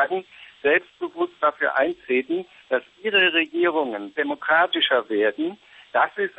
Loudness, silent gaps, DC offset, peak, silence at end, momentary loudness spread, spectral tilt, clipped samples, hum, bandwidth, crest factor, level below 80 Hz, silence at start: -22 LUFS; none; under 0.1%; -8 dBFS; 0.1 s; 10 LU; -5.5 dB/octave; under 0.1%; none; 7.4 kHz; 14 dB; -72 dBFS; 0 s